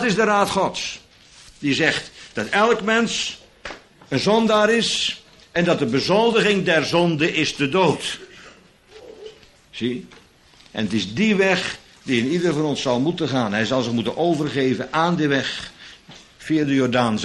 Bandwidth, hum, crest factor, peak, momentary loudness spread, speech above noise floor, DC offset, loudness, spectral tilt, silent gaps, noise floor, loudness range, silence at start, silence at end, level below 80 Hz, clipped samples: 12 kHz; none; 18 dB; -2 dBFS; 17 LU; 31 dB; under 0.1%; -20 LUFS; -4.5 dB/octave; none; -51 dBFS; 5 LU; 0 s; 0 s; -56 dBFS; under 0.1%